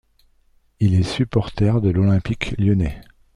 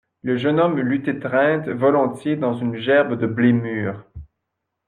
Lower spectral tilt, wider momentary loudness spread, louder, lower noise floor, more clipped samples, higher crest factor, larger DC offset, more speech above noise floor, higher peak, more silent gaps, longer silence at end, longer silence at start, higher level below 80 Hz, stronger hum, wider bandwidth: about the same, -8 dB/octave vs -8.5 dB/octave; second, 4 LU vs 7 LU; about the same, -20 LUFS vs -20 LUFS; second, -58 dBFS vs -79 dBFS; neither; about the same, 16 dB vs 16 dB; neither; second, 40 dB vs 59 dB; about the same, -4 dBFS vs -4 dBFS; neither; second, 0.35 s vs 0.65 s; first, 0.8 s vs 0.25 s; first, -38 dBFS vs -54 dBFS; neither; about the same, 10.5 kHz vs 10 kHz